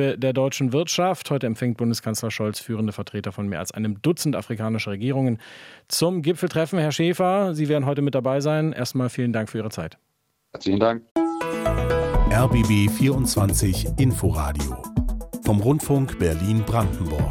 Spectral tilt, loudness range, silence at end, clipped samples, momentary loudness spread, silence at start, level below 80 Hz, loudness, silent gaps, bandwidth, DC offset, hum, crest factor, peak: -6 dB/octave; 5 LU; 0 s; under 0.1%; 8 LU; 0 s; -34 dBFS; -23 LUFS; 11.11-11.15 s; 16.5 kHz; under 0.1%; none; 18 dB; -4 dBFS